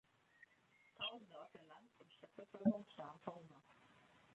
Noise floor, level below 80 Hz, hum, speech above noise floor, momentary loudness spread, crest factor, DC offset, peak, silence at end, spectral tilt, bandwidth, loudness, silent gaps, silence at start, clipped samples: -74 dBFS; -84 dBFS; none; 27 dB; 27 LU; 26 dB; under 0.1%; -24 dBFS; 0.6 s; -7 dB/octave; 7.8 kHz; -46 LUFS; none; 1 s; under 0.1%